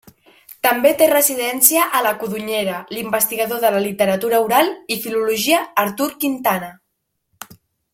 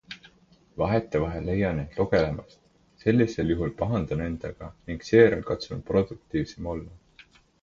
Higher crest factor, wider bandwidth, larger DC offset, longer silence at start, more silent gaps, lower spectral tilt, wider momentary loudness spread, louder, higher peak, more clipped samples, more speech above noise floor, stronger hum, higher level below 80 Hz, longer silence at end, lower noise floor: about the same, 18 dB vs 22 dB; first, 16.5 kHz vs 7.4 kHz; neither; first, 0.5 s vs 0.1 s; neither; second, -2.5 dB/octave vs -7.5 dB/octave; second, 9 LU vs 16 LU; first, -17 LUFS vs -26 LUFS; first, 0 dBFS vs -4 dBFS; neither; first, 56 dB vs 33 dB; neither; second, -62 dBFS vs -44 dBFS; second, 0.5 s vs 0.65 s; first, -73 dBFS vs -59 dBFS